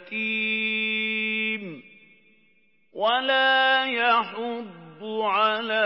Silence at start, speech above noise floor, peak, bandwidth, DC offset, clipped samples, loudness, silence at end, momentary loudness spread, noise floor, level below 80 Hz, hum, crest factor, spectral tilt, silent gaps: 0 s; 41 dB; -8 dBFS; 5.8 kHz; under 0.1%; under 0.1%; -23 LUFS; 0 s; 18 LU; -65 dBFS; -90 dBFS; none; 16 dB; -7.5 dB/octave; none